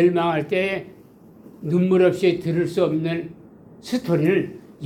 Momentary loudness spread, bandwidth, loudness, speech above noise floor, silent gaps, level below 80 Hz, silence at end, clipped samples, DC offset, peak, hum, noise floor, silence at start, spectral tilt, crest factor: 14 LU; 14 kHz; -21 LUFS; 27 dB; none; -60 dBFS; 0 s; under 0.1%; under 0.1%; -6 dBFS; none; -47 dBFS; 0 s; -7.5 dB/octave; 16 dB